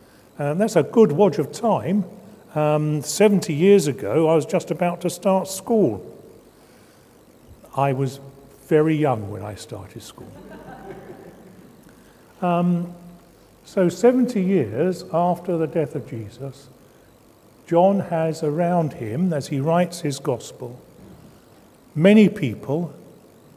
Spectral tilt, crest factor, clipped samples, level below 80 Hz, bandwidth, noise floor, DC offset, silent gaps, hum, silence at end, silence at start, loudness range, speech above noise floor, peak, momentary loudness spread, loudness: -6.5 dB/octave; 20 dB; under 0.1%; -58 dBFS; 16 kHz; -52 dBFS; under 0.1%; none; none; 0.55 s; 0.4 s; 8 LU; 31 dB; -2 dBFS; 20 LU; -20 LUFS